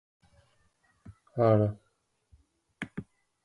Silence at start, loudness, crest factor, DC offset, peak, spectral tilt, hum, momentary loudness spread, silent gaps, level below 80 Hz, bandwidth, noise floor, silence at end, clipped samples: 1.1 s; -29 LUFS; 20 dB; under 0.1%; -12 dBFS; -9.5 dB/octave; none; 20 LU; none; -62 dBFS; 10.5 kHz; -74 dBFS; 0.45 s; under 0.1%